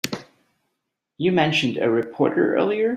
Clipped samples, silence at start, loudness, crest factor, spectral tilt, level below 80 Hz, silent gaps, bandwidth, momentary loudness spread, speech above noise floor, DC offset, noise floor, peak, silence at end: under 0.1%; 0.05 s; -21 LUFS; 20 dB; -5.5 dB/octave; -62 dBFS; none; 15.5 kHz; 7 LU; 58 dB; under 0.1%; -79 dBFS; -4 dBFS; 0 s